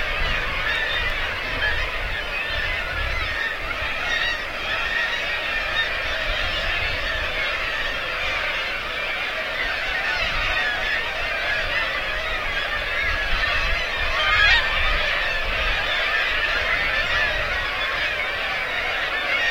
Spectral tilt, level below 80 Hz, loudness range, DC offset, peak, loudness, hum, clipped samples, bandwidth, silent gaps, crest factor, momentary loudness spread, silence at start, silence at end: -2.5 dB/octave; -34 dBFS; 4 LU; under 0.1%; -6 dBFS; -22 LUFS; none; under 0.1%; 16.5 kHz; none; 18 dB; 4 LU; 0 s; 0 s